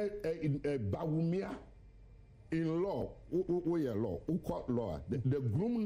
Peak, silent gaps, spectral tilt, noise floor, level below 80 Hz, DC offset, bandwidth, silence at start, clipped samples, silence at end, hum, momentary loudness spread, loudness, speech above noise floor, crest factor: -22 dBFS; none; -9.5 dB/octave; -57 dBFS; -56 dBFS; under 0.1%; 15.5 kHz; 0 s; under 0.1%; 0 s; none; 5 LU; -36 LUFS; 22 dB; 14 dB